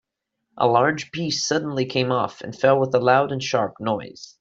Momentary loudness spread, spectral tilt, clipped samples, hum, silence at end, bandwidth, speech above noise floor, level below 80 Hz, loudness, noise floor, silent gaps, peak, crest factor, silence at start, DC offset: 9 LU; -4.5 dB/octave; under 0.1%; none; 0.15 s; 7.8 kHz; 57 dB; -62 dBFS; -21 LUFS; -78 dBFS; none; -4 dBFS; 18 dB; 0.55 s; under 0.1%